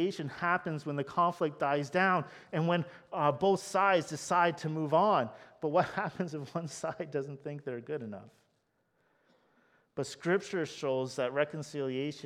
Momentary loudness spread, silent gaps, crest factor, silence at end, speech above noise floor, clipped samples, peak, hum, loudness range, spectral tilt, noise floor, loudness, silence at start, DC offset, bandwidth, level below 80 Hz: 12 LU; none; 20 dB; 0 s; 44 dB; under 0.1%; -14 dBFS; none; 11 LU; -5.5 dB/octave; -76 dBFS; -32 LUFS; 0 s; under 0.1%; 14.5 kHz; -76 dBFS